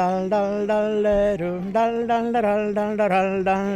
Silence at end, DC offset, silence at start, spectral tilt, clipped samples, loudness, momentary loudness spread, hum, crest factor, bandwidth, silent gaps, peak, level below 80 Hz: 0 s; under 0.1%; 0 s; -7 dB/octave; under 0.1%; -22 LUFS; 3 LU; none; 12 dB; 10 kHz; none; -10 dBFS; -46 dBFS